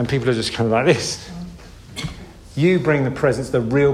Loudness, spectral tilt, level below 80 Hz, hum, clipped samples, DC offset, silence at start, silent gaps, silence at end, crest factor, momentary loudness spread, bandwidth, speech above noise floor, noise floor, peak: -19 LUFS; -5.5 dB/octave; -42 dBFS; none; under 0.1%; under 0.1%; 0 s; none; 0 s; 18 dB; 18 LU; 13.5 kHz; 21 dB; -39 dBFS; -2 dBFS